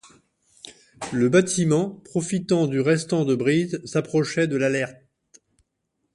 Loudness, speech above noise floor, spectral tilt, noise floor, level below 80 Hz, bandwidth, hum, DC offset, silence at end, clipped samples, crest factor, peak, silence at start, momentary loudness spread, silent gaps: -22 LUFS; 54 dB; -5.5 dB/octave; -76 dBFS; -62 dBFS; 11.5 kHz; none; under 0.1%; 1.25 s; under 0.1%; 18 dB; -4 dBFS; 0.65 s; 15 LU; none